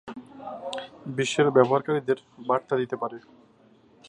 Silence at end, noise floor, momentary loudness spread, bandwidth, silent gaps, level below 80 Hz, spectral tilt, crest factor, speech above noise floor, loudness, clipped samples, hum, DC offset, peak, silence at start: 0.9 s; -58 dBFS; 19 LU; 11 kHz; none; -72 dBFS; -5.5 dB/octave; 24 dB; 32 dB; -26 LUFS; under 0.1%; none; under 0.1%; -4 dBFS; 0.05 s